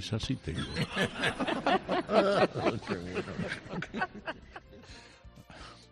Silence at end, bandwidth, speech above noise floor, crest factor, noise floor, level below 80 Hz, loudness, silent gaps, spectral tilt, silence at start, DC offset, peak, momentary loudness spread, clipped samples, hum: 0.05 s; 11.5 kHz; 22 dB; 22 dB; -53 dBFS; -54 dBFS; -32 LUFS; none; -5.5 dB/octave; 0 s; under 0.1%; -12 dBFS; 23 LU; under 0.1%; none